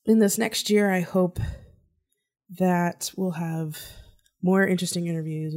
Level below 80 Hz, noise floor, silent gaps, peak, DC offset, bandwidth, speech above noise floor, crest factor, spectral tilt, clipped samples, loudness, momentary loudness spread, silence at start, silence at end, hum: -48 dBFS; -74 dBFS; none; -8 dBFS; under 0.1%; 16 kHz; 50 dB; 16 dB; -5 dB/octave; under 0.1%; -25 LUFS; 13 LU; 0.05 s; 0 s; none